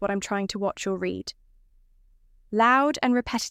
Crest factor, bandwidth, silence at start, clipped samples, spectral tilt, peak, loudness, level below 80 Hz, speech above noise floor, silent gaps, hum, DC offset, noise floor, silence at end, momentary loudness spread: 18 dB; 15.5 kHz; 0 s; under 0.1%; -4 dB/octave; -8 dBFS; -25 LUFS; -56 dBFS; 33 dB; none; none; under 0.1%; -58 dBFS; 0 s; 12 LU